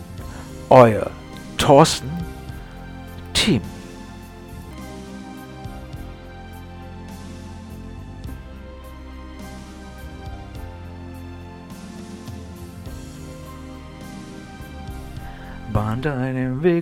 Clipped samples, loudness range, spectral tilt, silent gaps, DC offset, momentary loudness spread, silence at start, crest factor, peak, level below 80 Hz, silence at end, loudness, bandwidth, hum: under 0.1%; 19 LU; -5.5 dB/octave; none; under 0.1%; 22 LU; 0 s; 24 dB; 0 dBFS; -40 dBFS; 0 s; -18 LUFS; 18 kHz; none